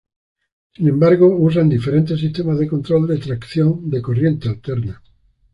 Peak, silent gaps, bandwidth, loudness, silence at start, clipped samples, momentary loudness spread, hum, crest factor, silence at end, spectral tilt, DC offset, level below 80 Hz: -2 dBFS; none; 5.4 kHz; -17 LUFS; 0.8 s; under 0.1%; 11 LU; none; 14 dB; 0.6 s; -10 dB/octave; under 0.1%; -46 dBFS